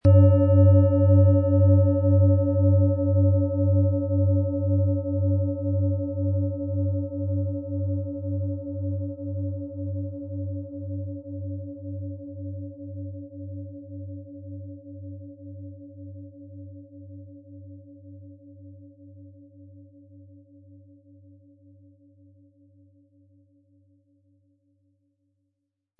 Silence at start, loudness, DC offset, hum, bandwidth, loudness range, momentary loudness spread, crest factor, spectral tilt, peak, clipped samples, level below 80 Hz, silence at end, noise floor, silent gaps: 0.05 s; -23 LUFS; under 0.1%; none; 1.9 kHz; 25 LU; 25 LU; 18 dB; -14 dB/octave; -6 dBFS; under 0.1%; -56 dBFS; 6.2 s; -81 dBFS; none